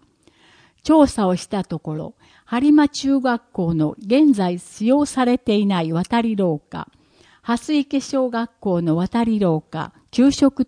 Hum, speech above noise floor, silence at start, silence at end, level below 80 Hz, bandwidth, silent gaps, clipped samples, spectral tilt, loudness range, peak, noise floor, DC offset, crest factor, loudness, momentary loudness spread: none; 37 dB; 0.85 s; 0 s; -50 dBFS; 10.5 kHz; none; under 0.1%; -6.5 dB/octave; 4 LU; -2 dBFS; -55 dBFS; under 0.1%; 18 dB; -19 LUFS; 14 LU